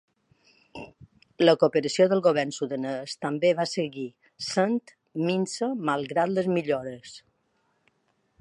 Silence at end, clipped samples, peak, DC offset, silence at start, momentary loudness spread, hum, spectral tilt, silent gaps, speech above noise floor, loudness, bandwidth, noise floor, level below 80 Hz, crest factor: 1.2 s; under 0.1%; -4 dBFS; under 0.1%; 0.75 s; 20 LU; none; -5 dB/octave; none; 46 dB; -26 LUFS; 11 kHz; -71 dBFS; -70 dBFS; 22 dB